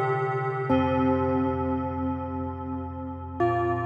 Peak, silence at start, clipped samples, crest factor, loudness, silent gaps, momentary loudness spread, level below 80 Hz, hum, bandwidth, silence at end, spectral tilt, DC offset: -12 dBFS; 0 s; under 0.1%; 14 dB; -27 LUFS; none; 10 LU; -48 dBFS; none; 6 kHz; 0 s; -9.5 dB/octave; under 0.1%